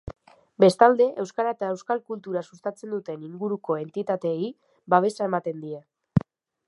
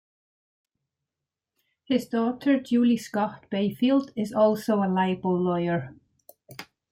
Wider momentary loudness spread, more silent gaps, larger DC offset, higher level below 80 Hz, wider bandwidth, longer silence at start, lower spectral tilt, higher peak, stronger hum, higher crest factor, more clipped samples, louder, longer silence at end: first, 16 LU vs 13 LU; neither; neither; first, -56 dBFS vs -68 dBFS; second, 11.5 kHz vs 16 kHz; second, 0.05 s vs 1.9 s; about the same, -7 dB/octave vs -7 dB/octave; first, -2 dBFS vs -10 dBFS; neither; first, 24 dB vs 16 dB; neither; about the same, -25 LUFS vs -25 LUFS; first, 0.5 s vs 0.3 s